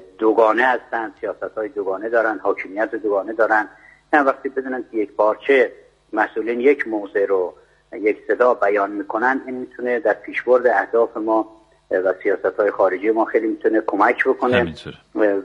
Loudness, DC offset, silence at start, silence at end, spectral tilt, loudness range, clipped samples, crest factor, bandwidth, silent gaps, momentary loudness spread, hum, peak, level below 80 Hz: -19 LUFS; under 0.1%; 0 s; 0 s; -6.5 dB/octave; 2 LU; under 0.1%; 18 dB; 7.8 kHz; none; 10 LU; none; 0 dBFS; -60 dBFS